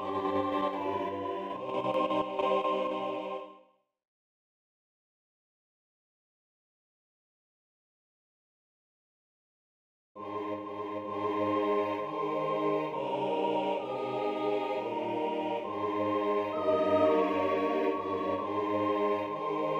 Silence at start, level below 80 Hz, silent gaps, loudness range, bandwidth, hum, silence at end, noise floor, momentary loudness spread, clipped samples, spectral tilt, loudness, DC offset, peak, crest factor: 0 s; -76 dBFS; 4.08-10.15 s; 13 LU; 14 kHz; none; 0 s; -63 dBFS; 8 LU; under 0.1%; -7 dB/octave; -31 LUFS; under 0.1%; -14 dBFS; 18 dB